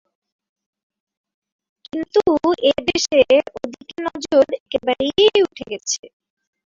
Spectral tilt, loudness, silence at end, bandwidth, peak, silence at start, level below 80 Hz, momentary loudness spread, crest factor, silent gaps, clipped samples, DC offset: -2.5 dB/octave; -18 LUFS; 0.6 s; 7.8 kHz; -2 dBFS; 1.95 s; -54 dBFS; 14 LU; 18 dB; 4.60-4.66 s, 5.99-6.03 s; under 0.1%; under 0.1%